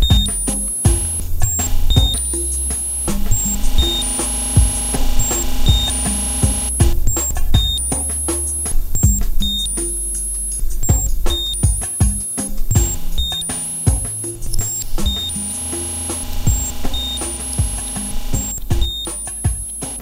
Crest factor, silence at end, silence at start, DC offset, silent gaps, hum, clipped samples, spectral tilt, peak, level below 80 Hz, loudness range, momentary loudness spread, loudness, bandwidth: 16 dB; 0 s; 0 s; under 0.1%; none; none; under 0.1%; -3 dB/octave; 0 dBFS; -20 dBFS; 4 LU; 6 LU; -18 LUFS; 16.5 kHz